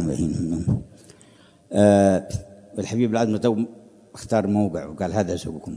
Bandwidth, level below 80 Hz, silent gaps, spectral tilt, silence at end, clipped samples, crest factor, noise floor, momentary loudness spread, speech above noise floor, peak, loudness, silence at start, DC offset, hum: 11 kHz; -48 dBFS; none; -7 dB/octave; 0 s; under 0.1%; 20 dB; -52 dBFS; 15 LU; 31 dB; -2 dBFS; -22 LUFS; 0 s; under 0.1%; none